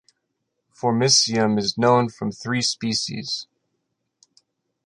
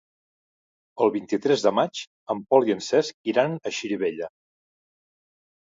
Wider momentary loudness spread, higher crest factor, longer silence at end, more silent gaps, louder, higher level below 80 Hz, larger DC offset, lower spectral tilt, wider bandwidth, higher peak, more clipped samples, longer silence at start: about the same, 12 LU vs 11 LU; about the same, 20 dB vs 22 dB; about the same, 1.45 s vs 1.5 s; second, none vs 2.07-2.26 s, 3.14-3.24 s; first, -21 LUFS vs -24 LUFS; first, -62 dBFS vs -72 dBFS; neither; second, -3.5 dB/octave vs -5 dB/octave; first, 11 kHz vs 7.8 kHz; about the same, -4 dBFS vs -4 dBFS; neither; about the same, 0.85 s vs 0.95 s